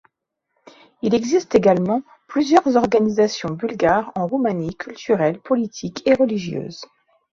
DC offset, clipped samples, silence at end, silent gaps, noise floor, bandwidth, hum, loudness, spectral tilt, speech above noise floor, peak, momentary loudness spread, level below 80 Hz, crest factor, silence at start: under 0.1%; under 0.1%; 0.55 s; none; -75 dBFS; 7.6 kHz; none; -19 LUFS; -6 dB/octave; 56 dB; 0 dBFS; 11 LU; -56 dBFS; 18 dB; 1.05 s